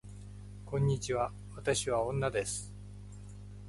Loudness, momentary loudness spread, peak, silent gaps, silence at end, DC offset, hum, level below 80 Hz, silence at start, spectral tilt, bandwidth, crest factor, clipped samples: -34 LUFS; 18 LU; -16 dBFS; none; 0 s; under 0.1%; 50 Hz at -45 dBFS; -52 dBFS; 0.05 s; -4.5 dB/octave; 11.5 kHz; 18 dB; under 0.1%